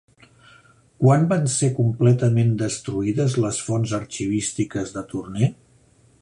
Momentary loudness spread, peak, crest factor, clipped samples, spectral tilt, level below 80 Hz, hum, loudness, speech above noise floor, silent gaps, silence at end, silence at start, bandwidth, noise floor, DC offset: 9 LU; -4 dBFS; 18 dB; under 0.1%; -6 dB/octave; -52 dBFS; none; -22 LUFS; 36 dB; none; 0.7 s; 1 s; 11 kHz; -56 dBFS; under 0.1%